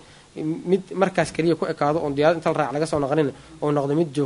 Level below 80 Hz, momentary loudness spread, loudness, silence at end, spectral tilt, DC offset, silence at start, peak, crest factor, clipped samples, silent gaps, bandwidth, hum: -54 dBFS; 8 LU; -23 LUFS; 0 s; -6.5 dB/octave; under 0.1%; 0.35 s; -4 dBFS; 18 dB; under 0.1%; none; 11 kHz; none